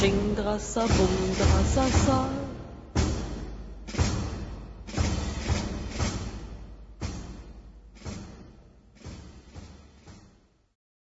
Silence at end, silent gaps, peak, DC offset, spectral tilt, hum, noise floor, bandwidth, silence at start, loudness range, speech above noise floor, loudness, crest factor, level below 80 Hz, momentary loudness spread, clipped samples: 0.9 s; none; -10 dBFS; under 0.1%; -5.5 dB/octave; none; -60 dBFS; 8 kHz; 0 s; 20 LU; 36 dB; -28 LUFS; 20 dB; -36 dBFS; 23 LU; under 0.1%